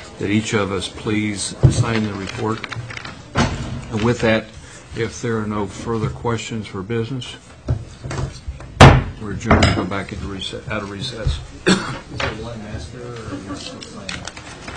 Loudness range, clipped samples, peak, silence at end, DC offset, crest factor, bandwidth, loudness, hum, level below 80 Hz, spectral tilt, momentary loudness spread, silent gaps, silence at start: 8 LU; under 0.1%; 0 dBFS; 0 s; 0.2%; 20 dB; 11 kHz; -20 LUFS; none; -32 dBFS; -5.5 dB/octave; 15 LU; none; 0 s